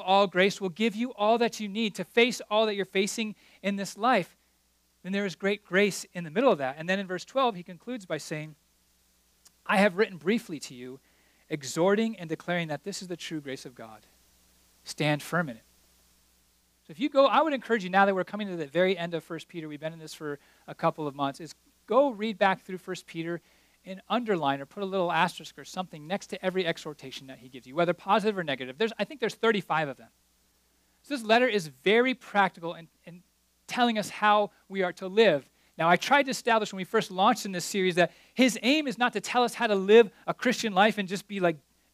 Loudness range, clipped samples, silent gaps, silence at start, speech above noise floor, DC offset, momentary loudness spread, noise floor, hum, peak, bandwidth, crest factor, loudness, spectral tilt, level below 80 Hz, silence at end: 7 LU; under 0.1%; none; 0 s; 41 dB; under 0.1%; 16 LU; -69 dBFS; none; -6 dBFS; 15.5 kHz; 22 dB; -27 LUFS; -4.5 dB/octave; -74 dBFS; 0.35 s